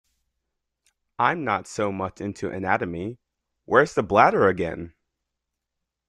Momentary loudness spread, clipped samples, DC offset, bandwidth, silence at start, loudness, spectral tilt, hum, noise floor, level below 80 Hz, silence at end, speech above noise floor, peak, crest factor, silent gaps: 14 LU; under 0.1%; under 0.1%; 11.5 kHz; 1.2 s; -23 LUFS; -6 dB/octave; none; -83 dBFS; -58 dBFS; 1.2 s; 60 dB; -2 dBFS; 24 dB; none